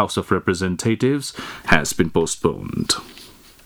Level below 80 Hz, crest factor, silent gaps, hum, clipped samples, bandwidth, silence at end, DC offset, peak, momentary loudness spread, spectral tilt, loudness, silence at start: -42 dBFS; 22 dB; none; none; under 0.1%; over 20 kHz; 0.35 s; under 0.1%; 0 dBFS; 8 LU; -4 dB/octave; -21 LUFS; 0 s